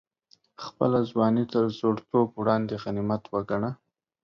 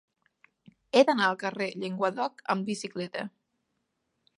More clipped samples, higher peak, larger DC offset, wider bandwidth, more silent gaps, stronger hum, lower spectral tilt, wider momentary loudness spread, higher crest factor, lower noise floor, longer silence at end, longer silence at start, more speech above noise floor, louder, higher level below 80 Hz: neither; second, -10 dBFS vs -6 dBFS; neither; second, 6.8 kHz vs 11.5 kHz; neither; neither; first, -8.5 dB/octave vs -4.5 dB/octave; second, 9 LU vs 12 LU; second, 18 dB vs 24 dB; second, -64 dBFS vs -79 dBFS; second, 0.5 s vs 1.1 s; second, 0.6 s vs 0.95 s; second, 39 dB vs 51 dB; about the same, -26 LUFS vs -28 LUFS; first, -60 dBFS vs -82 dBFS